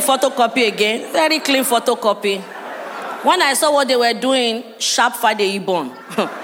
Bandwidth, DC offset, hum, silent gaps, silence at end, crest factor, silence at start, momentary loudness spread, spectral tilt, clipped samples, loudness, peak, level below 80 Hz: 17 kHz; under 0.1%; none; none; 0 s; 16 dB; 0 s; 10 LU; -2 dB/octave; under 0.1%; -16 LUFS; -2 dBFS; -76 dBFS